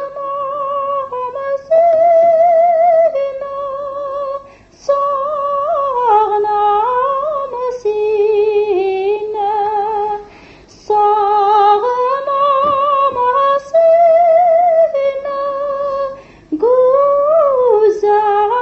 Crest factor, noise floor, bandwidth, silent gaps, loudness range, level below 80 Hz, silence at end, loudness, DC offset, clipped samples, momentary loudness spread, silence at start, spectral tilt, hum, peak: 12 dB; -40 dBFS; 6.8 kHz; none; 4 LU; -52 dBFS; 0 s; -13 LUFS; under 0.1%; under 0.1%; 11 LU; 0 s; -5 dB/octave; none; -2 dBFS